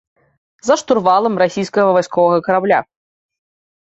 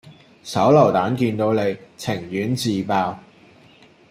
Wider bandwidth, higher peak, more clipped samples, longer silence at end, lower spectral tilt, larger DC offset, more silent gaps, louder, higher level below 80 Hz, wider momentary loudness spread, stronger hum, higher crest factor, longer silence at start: second, 8 kHz vs 16 kHz; about the same, -2 dBFS vs -2 dBFS; neither; first, 1.05 s vs 0.9 s; second, -5 dB/octave vs -6.5 dB/octave; neither; neither; first, -15 LUFS vs -20 LUFS; about the same, -60 dBFS vs -60 dBFS; second, 4 LU vs 13 LU; neither; second, 14 dB vs 20 dB; first, 0.65 s vs 0.05 s